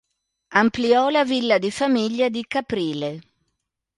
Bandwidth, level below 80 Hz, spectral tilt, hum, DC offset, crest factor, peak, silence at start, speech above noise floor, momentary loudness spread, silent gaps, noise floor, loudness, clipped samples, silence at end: 11.5 kHz; -60 dBFS; -5 dB/octave; none; under 0.1%; 18 dB; -4 dBFS; 0.5 s; 57 dB; 9 LU; none; -77 dBFS; -21 LUFS; under 0.1%; 0.75 s